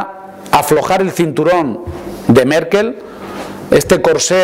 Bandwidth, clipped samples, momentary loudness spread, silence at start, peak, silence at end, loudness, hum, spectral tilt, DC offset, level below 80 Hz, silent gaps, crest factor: 16.5 kHz; under 0.1%; 16 LU; 0 s; 0 dBFS; 0 s; -13 LUFS; none; -4.5 dB/octave; under 0.1%; -40 dBFS; none; 12 dB